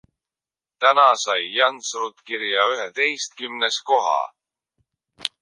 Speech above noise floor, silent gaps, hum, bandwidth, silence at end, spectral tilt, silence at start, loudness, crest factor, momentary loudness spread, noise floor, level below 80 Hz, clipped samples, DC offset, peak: over 69 dB; none; none; 11.5 kHz; 0.15 s; 0.5 dB/octave; 0.8 s; -20 LUFS; 20 dB; 13 LU; under -90 dBFS; -78 dBFS; under 0.1%; under 0.1%; -2 dBFS